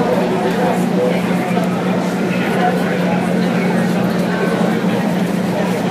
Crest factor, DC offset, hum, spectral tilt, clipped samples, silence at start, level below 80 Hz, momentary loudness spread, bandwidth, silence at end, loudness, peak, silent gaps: 14 dB; under 0.1%; none; -6.5 dB/octave; under 0.1%; 0 s; -52 dBFS; 2 LU; 15.5 kHz; 0 s; -16 LUFS; -2 dBFS; none